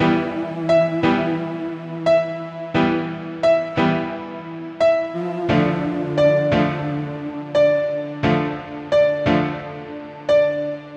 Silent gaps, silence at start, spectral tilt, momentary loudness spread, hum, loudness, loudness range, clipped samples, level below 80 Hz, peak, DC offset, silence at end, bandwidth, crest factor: none; 0 s; -7.5 dB/octave; 12 LU; none; -20 LUFS; 2 LU; under 0.1%; -50 dBFS; -4 dBFS; under 0.1%; 0 s; 8.4 kHz; 16 dB